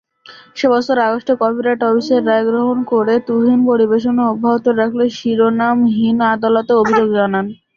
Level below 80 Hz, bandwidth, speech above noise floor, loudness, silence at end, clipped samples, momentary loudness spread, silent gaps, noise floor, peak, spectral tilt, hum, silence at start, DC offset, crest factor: -58 dBFS; 7 kHz; 28 dB; -14 LUFS; 0.2 s; under 0.1%; 4 LU; none; -42 dBFS; -2 dBFS; -6.5 dB/octave; none; 0.3 s; under 0.1%; 12 dB